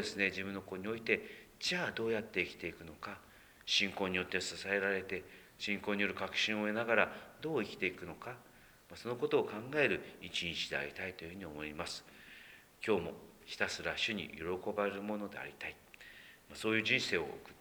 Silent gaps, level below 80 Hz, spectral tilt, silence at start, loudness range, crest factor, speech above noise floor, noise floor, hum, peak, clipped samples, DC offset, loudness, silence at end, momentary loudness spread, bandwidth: none; -68 dBFS; -3.5 dB/octave; 0 s; 4 LU; 26 dB; 20 dB; -58 dBFS; none; -12 dBFS; under 0.1%; under 0.1%; -37 LUFS; 0 s; 17 LU; over 20 kHz